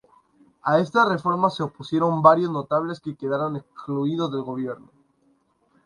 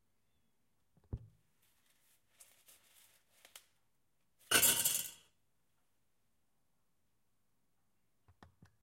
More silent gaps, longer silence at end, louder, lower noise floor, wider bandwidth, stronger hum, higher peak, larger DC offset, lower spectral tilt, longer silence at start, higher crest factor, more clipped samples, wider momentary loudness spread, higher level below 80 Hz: neither; second, 1.1 s vs 3.7 s; first, -23 LUFS vs -30 LUFS; second, -65 dBFS vs -84 dBFS; second, 11 kHz vs 16.5 kHz; neither; first, 0 dBFS vs -14 dBFS; neither; first, -7.5 dB/octave vs 0 dB/octave; second, 0.65 s vs 1.1 s; second, 22 dB vs 28 dB; neither; second, 14 LU vs 23 LU; about the same, -68 dBFS vs -66 dBFS